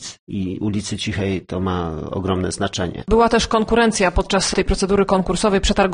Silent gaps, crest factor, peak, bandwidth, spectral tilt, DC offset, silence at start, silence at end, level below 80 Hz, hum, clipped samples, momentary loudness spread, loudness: 0.19-0.27 s; 16 dB; -2 dBFS; 10 kHz; -4.5 dB/octave; under 0.1%; 0 s; 0 s; -30 dBFS; none; under 0.1%; 9 LU; -19 LUFS